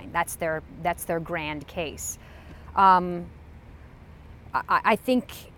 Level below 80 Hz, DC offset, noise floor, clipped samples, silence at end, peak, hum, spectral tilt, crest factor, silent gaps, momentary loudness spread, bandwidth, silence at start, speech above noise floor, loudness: -48 dBFS; under 0.1%; -47 dBFS; under 0.1%; 0.05 s; -6 dBFS; none; -4.5 dB/octave; 22 dB; none; 17 LU; 17.5 kHz; 0 s; 21 dB; -25 LUFS